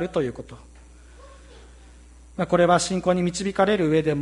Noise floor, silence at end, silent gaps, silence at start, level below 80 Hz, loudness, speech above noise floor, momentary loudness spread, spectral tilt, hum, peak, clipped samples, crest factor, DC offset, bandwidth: -47 dBFS; 0 s; none; 0 s; -48 dBFS; -22 LUFS; 25 dB; 18 LU; -5.5 dB/octave; 60 Hz at -45 dBFS; -6 dBFS; under 0.1%; 18 dB; under 0.1%; 11.5 kHz